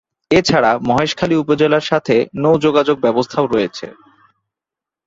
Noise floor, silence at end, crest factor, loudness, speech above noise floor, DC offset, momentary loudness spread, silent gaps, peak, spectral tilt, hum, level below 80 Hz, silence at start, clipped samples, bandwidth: -86 dBFS; 1.15 s; 16 dB; -15 LUFS; 72 dB; under 0.1%; 4 LU; none; 0 dBFS; -5.5 dB/octave; none; -50 dBFS; 0.3 s; under 0.1%; 7.8 kHz